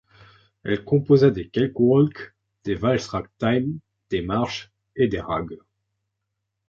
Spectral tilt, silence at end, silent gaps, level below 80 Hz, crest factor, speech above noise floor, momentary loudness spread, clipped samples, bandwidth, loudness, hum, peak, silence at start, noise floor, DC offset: -7.5 dB/octave; 1.15 s; none; -50 dBFS; 18 dB; 58 dB; 18 LU; under 0.1%; 7.4 kHz; -22 LUFS; none; -4 dBFS; 0.65 s; -80 dBFS; under 0.1%